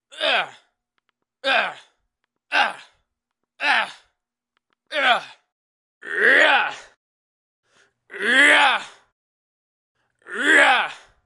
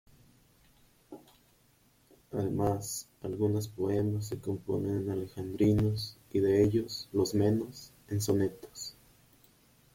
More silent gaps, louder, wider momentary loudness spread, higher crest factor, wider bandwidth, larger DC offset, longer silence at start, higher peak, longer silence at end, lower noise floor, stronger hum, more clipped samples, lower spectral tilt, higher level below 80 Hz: first, 5.52-6.01 s, 6.97-7.63 s, 9.12-9.95 s vs none; first, -18 LUFS vs -32 LUFS; about the same, 15 LU vs 16 LU; about the same, 22 dB vs 18 dB; second, 11.5 kHz vs 16.5 kHz; neither; second, 0.15 s vs 1.1 s; first, 0 dBFS vs -14 dBFS; second, 0.3 s vs 1 s; first, -81 dBFS vs -66 dBFS; neither; neither; second, -0.5 dB/octave vs -6.5 dB/octave; second, -78 dBFS vs -58 dBFS